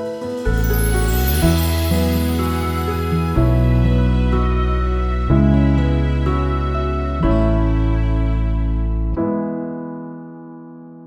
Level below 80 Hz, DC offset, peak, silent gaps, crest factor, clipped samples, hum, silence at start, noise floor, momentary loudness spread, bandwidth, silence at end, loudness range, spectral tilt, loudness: -20 dBFS; under 0.1%; -2 dBFS; none; 14 dB; under 0.1%; none; 0 s; -37 dBFS; 11 LU; over 20 kHz; 0 s; 3 LU; -7 dB/octave; -18 LUFS